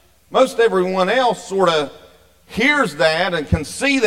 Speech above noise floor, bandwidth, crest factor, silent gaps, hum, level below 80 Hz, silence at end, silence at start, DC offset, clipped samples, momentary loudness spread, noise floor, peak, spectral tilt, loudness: 31 dB; 16 kHz; 16 dB; none; none; -40 dBFS; 0 s; 0.3 s; 0.2%; under 0.1%; 6 LU; -47 dBFS; -2 dBFS; -4.5 dB/octave; -17 LUFS